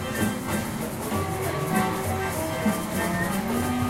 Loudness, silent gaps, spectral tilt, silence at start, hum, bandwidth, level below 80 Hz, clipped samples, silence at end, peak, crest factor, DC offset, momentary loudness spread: -27 LUFS; none; -5 dB/octave; 0 s; none; 16 kHz; -46 dBFS; under 0.1%; 0 s; -10 dBFS; 16 dB; under 0.1%; 4 LU